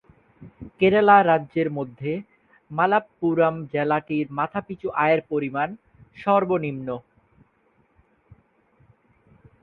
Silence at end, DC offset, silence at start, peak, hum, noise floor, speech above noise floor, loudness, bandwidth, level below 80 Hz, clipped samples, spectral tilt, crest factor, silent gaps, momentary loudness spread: 2.65 s; under 0.1%; 0.4 s; -2 dBFS; none; -64 dBFS; 42 dB; -22 LUFS; 4.6 kHz; -60 dBFS; under 0.1%; -9.5 dB/octave; 22 dB; none; 16 LU